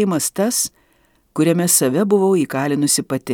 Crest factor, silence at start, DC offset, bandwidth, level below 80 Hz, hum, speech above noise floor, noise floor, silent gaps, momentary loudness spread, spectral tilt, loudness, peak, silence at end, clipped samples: 16 dB; 0 s; under 0.1%; 19.5 kHz; -62 dBFS; none; 42 dB; -59 dBFS; none; 6 LU; -4 dB/octave; -17 LUFS; -2 dBFS; 0 s; under 0.1%